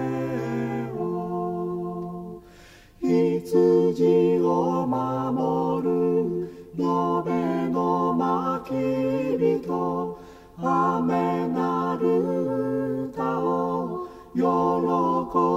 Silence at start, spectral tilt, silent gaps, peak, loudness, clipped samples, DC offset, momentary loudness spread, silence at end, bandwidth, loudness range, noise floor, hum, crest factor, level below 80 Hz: 0 s; -8.5 dB/octave; none; -8 dBFS; -24 LUFS; under 0.1%; under 0.1%; 10 LU; 0 s; 14.5 kHz; 3 LU; -49 dBFS; none; 14 dB; -56 dBFS